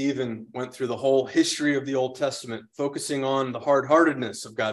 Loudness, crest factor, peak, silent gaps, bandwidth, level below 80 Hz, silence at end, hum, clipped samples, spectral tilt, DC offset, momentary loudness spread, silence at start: -25 LUFS; 18 dB; -6 dBFS; none; 12.5 kHz; -70 dBFS; 0 s; none; under 0.1%; -4.5 dB/octave; under 0.1%; 12 LU; 0 s